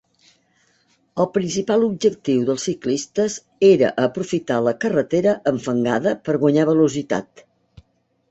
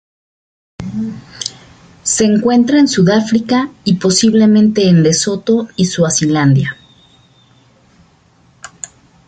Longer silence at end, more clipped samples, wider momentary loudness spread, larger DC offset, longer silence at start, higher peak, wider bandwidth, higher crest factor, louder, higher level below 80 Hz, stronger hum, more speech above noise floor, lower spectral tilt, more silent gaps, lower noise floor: first, 1.1 s vs 0.4 s; neither; second, 8 LU vs 15 LU; neither; first, 1.15 s vs 0.8 s; about the same, -4 dBFS vs -2 dBFS; second, 8.2 kHz vs 9.4 kHz; first, 18 dB vs 12 dB; second, -20 LUFS vs -12 LUFS; second, -60 dBFS vs -48 dBFS; neither; first, 45 dB vs 39 dB; about the same, -5.5 dB/octave vs -5 dB/octave; neither; first, -64 dBFS vs -50 dBFS